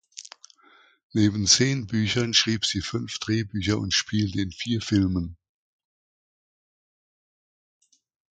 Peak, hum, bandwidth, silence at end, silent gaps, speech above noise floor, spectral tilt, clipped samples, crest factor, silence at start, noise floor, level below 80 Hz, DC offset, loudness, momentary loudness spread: -4 dBFS; none; 9.4 kHz; 2.95 s; 1.03-1.10 s; 34 dB; -3.5 dB/octave; under 0.1%; 22 dB; 0.15 s; -58 dBFS; -48 dBFS; under 0.1%; -24 LUFS; 12 LU